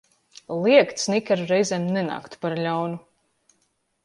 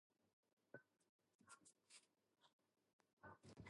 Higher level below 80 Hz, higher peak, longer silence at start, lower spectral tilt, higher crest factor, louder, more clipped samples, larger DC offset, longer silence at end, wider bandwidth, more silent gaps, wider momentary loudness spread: first, -70 dBFS vs -88 dBFS; first, -4 dBFS vs -44 dBFS; first, 0.5 s vs 0.1 s; about the same, -5 dB/octave vs -4 dB/octave; second, 20 dB vs 26 dB; first, -23 LUFS vs -68 LUFS; neither; neither; first, 1.05 s vs 0 s; about the same, 11.5 kHz vs 11.5 kHz; second, none vs 0.33-0.43 s, 0.53-0.57 s, 1.09-1.19 s, 1.35-1.39 s, 2.53-2.59 s, 2.93-2.99 s, 3.13-3.17 s; first, 13 LU vs 4 LU